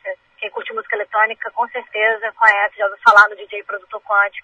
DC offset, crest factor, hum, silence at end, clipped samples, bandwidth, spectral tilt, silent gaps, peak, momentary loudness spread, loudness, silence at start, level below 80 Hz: under 0.1%; 18 dB; none; 0.05 s; under 0.1%; 9.6 kHz; -1 dB/octave; none; 0 dBFS; 17 LU; -16 LUFS; 0.05 s; -66 dBFS